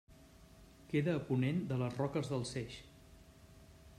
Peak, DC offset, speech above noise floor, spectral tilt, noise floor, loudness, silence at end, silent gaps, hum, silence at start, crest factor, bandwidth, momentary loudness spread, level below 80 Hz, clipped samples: -22 dBFS; under 0.1%; 24 dB; -7 dB/octave; -60 dBFS; -37 LUFS; 0 s; none; none; 0.1 s; 18 dB; 13.5 kHz; 13 LU; -64 dBFS; under 0.1%